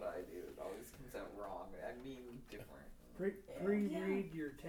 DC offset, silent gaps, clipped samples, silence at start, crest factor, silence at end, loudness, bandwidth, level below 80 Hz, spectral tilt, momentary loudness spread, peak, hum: under 0.1%; none; under 0.1%; 0 s; 18 dB; 0 s; -45 LUFS; over 20 kHz; -64 dBFS; -7 dB/octave; 16 LU; -26 dBFS; none